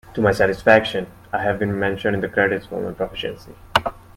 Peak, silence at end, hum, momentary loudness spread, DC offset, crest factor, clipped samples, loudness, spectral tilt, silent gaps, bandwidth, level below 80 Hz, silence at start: 0 dBFS; 0.2 s; none; 13 LU; under 0.1%; 20 dB; under 0.1%; -20 LUFS; -6 dB/octave; none; 16.5 kHz; -46 dBFS; 0.05 s